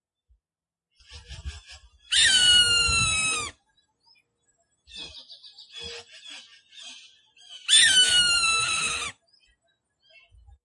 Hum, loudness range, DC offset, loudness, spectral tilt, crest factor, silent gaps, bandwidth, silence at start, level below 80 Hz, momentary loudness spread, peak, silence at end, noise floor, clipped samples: none; 21 LU; under 0.1%; -19 LUFS; 1 dB/octave; 22 dB; none; 11.5 kHz; 1.1 s; -50 dBFS; 26 LU; -4 dBFS; 1.55 s; under -90 dBFS; under 0.1%